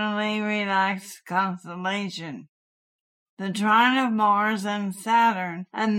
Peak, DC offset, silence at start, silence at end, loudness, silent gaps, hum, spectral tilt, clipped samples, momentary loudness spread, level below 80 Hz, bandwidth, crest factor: -6 dBFS; under 0.1%; 0 s; 0 s; -24 LUFS; 2.49-3.37 s; none; -4.5 dB/octave; under 0.1%; 13 LU; -80 dBFS; 16 kHz; 18 dB